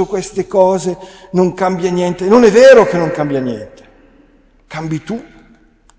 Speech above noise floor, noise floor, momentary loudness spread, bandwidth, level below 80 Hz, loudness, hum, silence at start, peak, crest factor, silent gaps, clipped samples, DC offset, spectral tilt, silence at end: 37 dB; -48 dBFS; 20 LU; 8 kHz; -46 dBFS; -12 LUFS; none; 0 s; 0 dBFS; 14 dB; none; 0.2%; under 0.1%; -6 dB/octave; 0.75 s